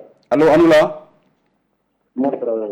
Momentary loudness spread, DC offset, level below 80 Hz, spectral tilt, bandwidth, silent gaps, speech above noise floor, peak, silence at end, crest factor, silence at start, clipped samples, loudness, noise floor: 16 LU; under 0.1%; -50 dBFS; -6.5 dB/octave; 13 kHz; none; 53 dB; -6 dBFS; 0 s; 12 dB; 0.3 s; under 0.1%; -15 LUFS; -67 dBFS